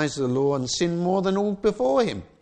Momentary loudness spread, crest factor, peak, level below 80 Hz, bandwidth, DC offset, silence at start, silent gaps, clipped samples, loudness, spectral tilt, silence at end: 2 LU; 14 dB; -8 dBFS; -54 dBFS; 9.4 kHz; under 0.1%; 0 s; none; under 0.1%; -23 LUFS; -5.5 dB/octave; 0.15 s